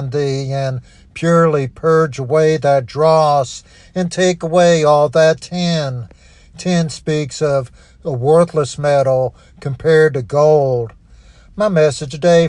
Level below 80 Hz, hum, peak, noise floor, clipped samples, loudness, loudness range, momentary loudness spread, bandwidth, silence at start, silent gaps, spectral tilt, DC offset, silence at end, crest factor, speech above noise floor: -46 dBFS; none; 0 dBFS; -43 dBFS; under 0.1%; -15 LUFS; 4 LU; 13 LU; 10.5 kHz; 0 s; none; -6 dB/octave; under 0.1%; 0 s; 14 dB; 29 dB